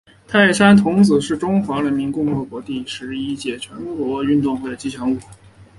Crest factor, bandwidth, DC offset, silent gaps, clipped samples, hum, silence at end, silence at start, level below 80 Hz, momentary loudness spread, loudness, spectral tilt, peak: 18 dB; 11.5 kHz; under 0.1%; none; under 0.1%; none; 0.15 s; 0.3 s; -50 dBFS; 15 LU; -18 LUFS; -5.5 dB/octave; 0 dBFS